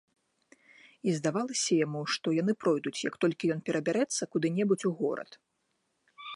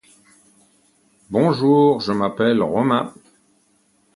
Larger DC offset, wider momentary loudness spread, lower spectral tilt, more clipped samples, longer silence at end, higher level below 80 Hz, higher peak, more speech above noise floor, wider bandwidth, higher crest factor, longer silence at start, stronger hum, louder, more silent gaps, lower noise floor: neither; about the same, 6 LU vs 7 LU; second, -4.5 dB/octave vs -7.5 dB/octave; neither; second, 0 s vs 1.05 s; second, -78 dBFS vs -58 dBFS; second, -16 dBFS vs -2 dBFS; first, 48 dB vs 44 dB; about the same, 11.5 kHz vs 11.5 kHz; about the same, 16 dB vs 18 dB; second, 1.05 s vs 1.3 s; neither; second, -30 LUFS vs -18 LUFS; neither; first, -78 dBFS vs -61 dBFS